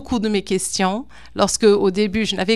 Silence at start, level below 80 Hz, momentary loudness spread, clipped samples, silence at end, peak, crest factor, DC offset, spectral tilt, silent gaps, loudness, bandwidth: 0 s; -44 dBFS; 7 LU; under 0.1%; 0 s; -2 dBFS; 18 dB; 0.9%; -4 dB/octave; none; -19 LUFS; 13.5 kHz